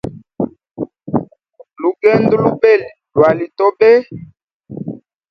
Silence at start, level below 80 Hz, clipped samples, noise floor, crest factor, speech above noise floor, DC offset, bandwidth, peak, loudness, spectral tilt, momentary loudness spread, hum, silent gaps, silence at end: 0.05 s; -50 dBFS; under 0.1%; -45 dBFS; 16 dB; 33 dB; under 0.1%; 6 kHz; 0 dBFS; -14 LUFS; -8.5 dB/octave; 18 LU; none; 4.53-4.60 s; 0.35 s